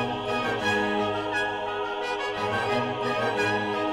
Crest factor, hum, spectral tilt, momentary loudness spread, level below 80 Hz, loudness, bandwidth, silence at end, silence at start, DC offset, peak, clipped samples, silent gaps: 14 dB; none; -4.5 dB/octave; 4 LU; -58 dBFS; -27 LUFS; 15.5 kHz; 0 s; 0 s; under 0.1%; -12 dBFS; under 0.1%; none